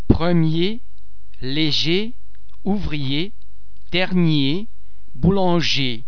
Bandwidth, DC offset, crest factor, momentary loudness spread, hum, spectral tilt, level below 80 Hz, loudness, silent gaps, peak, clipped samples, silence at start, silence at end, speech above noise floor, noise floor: 5.4 kHz; 10%; 22 dB; 13 LU; none; -6 dB/octave; -34 dBFS; -20 LUFS; none; 0 dBFS; under 0.1%; 0.05 s; 0.05 s; 28 dB; -47 dBFS